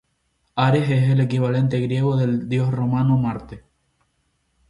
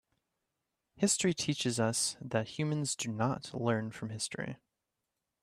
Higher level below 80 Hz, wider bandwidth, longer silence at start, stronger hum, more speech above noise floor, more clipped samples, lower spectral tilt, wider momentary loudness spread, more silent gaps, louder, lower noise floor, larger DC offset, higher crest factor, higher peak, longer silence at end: first, -52 dBFS vs -72 dBFS; second, 10.5 kHz vs 15.5 kHz; second, 0.55 s vs 0.95 s; neither; about the same, 50 dB vs 53 dB; neither; first, -8.5 dB/octave vs -4 dB/octave; about the same, 7 LU vs 9 LU; neither; first, -20 LUFS vs -33 LUFS; second, -69 dBFS vs -87 dBFS; neither; about the same, 16 dB vs 20 dB; first, -6 dBFS vs -16 dBFS; first, 1.1 s vs 0.9 s